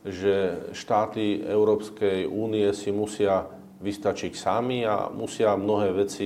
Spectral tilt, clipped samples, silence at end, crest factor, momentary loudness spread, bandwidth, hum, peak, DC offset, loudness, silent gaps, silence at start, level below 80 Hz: -5.5 dB/octave; under 0.1%; 0 s; 16 dB; 6 LU; 13.5 kHz; none; -10 dBFS; under 0.1%; -26 LUFS; none; 0.05 s; -64 dBFS